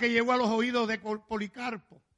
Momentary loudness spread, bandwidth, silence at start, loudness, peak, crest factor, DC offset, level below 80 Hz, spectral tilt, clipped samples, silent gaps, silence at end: 12 LU; 10.5 kHz; 0 s; -29 LUFS; -12 dBFS; 16 dB; under 0.1%; -66 dBFS; -4.5 dB/octave; under 0.1%; none; 0.4 s